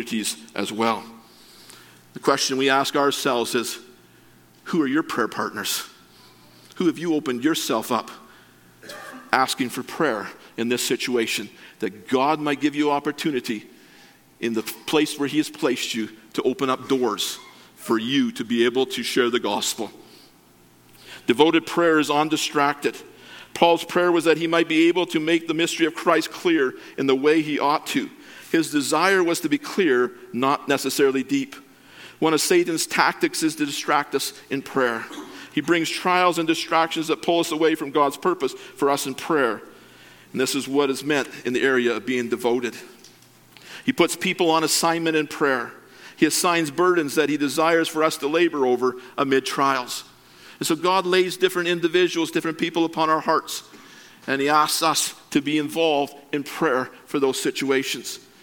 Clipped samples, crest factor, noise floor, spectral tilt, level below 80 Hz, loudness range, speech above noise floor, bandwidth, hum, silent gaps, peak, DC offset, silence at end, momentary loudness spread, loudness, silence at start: under 0.1%; 22 dB; -54 dBFS; -3.5 dB/octave; -70 dBFS; 4 LU; 32 dB; 17.5 kHz; none; none; 0 dBFS; under 0.1%; 0.25 s; 10 LU; -22 LUFS; 0 s